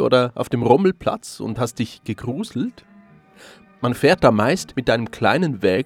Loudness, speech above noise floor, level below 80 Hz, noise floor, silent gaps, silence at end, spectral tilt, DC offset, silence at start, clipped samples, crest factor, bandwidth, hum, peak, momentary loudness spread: -20 LUFS; 30 dB; -48 dBFS; -49 dBFS; none; 0 s; -6 dB/octave; under 0.1%; 0 s; under 0.1%; 20 dB; 16.5 kHz; none; 0 dBFS; 12 LU